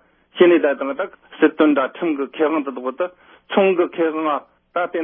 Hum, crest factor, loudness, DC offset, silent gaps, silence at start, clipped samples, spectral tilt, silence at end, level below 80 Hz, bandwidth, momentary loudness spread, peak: none; 16 dB; -19 LUFS; under 0.1%; none; 0.35 s; under 0.1%; -10.5 dB/octave; 0 s; -72 dBFS; 3.7 kHz; 12 LU; -2 dBFS